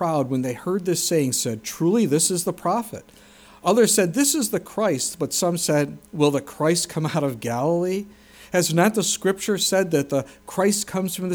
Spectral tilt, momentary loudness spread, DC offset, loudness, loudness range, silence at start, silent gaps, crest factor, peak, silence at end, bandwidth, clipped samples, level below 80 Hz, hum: -4 dB/octave; 8 LU; under 0.1%; -22 LUFS; 2 LU; 0 s; none; 18 dB; -4 dBFS; 0 s; over 20 kHz; under 0.1%; -60 dBFS; none